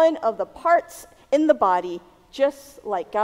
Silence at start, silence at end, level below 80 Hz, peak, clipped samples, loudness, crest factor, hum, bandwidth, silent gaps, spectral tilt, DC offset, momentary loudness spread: 0 s; 0 s; -60 dBFS; -4 dBFS; under 0.1%; -22 LUFS; 18 dB; none; 16 kHz; none; -4.5 dB/octave; under 0.1%; 20 LU